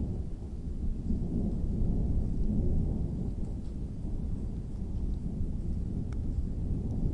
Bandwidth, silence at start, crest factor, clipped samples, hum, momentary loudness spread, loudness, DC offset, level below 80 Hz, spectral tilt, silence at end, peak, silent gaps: 5.6 kHz; 0 s; 14 dB; under 0.1%; none; 7 LU; -35 LUFS; under 0.1%; -34 dBFS; -10.5 dB/octave; 0 s; -18 dBFS; none